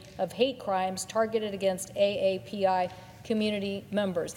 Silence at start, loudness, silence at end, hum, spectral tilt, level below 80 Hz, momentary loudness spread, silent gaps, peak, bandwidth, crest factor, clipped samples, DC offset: 0 s; -29 LUFS; 0 s; none; -4.5 dB/octave; -64 dBFS; 6 LU; none; -12 dBFS; 17 kHz; 18 dB; under 0.1%; under 0.1%